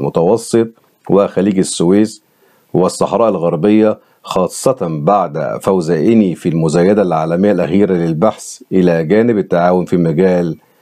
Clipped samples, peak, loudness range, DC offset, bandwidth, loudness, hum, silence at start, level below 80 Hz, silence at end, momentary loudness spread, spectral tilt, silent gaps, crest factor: under 0.1%; 0 dBFS; 2 LU; under 0.1%; 14.5 kHz; -13 LUFS; none; 0 s; -52 dBFS; 0.25 s; 6 LU; -6.5 dB/octave; none; 12 dB